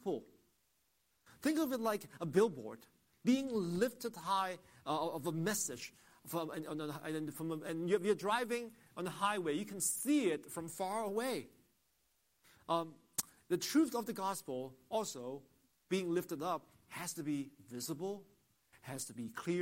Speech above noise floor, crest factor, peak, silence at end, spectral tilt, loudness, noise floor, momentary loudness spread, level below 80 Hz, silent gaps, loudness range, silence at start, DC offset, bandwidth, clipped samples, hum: 41 dB; 24 dB; -14 dBFS; 0 s; -4.5 dB/octave; -38 LUFS; -79 dBFS; 13 LU; -80 dBFS; none; 5 LU; 0 s; under 0.1%; 16 kHz; under 0.1%; none